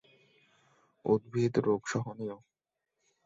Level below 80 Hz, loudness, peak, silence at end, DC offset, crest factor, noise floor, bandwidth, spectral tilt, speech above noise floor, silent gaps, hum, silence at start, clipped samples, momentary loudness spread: -68 dBFS; -32 LUFS; -14 dBFS; 0.9 s; under 0.1%; 20 dB; -87 dBFS; 7.8 kHz; -6.5 dB/octave; 57 dB; none; none; 1.05 s; under 0.1%; 13 LU